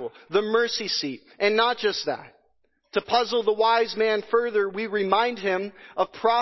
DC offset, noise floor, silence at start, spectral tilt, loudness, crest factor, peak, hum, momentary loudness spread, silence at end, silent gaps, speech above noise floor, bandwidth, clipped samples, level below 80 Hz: under 0.1%; -69 dBFS; 0 s; -3.5 dB/octave; -24 LUFS; 18 dB; -6 dBFS; none; 8 LU; 0 s; none; 45 dB; 6.2 kHz; under 0.1%; -70 dBFS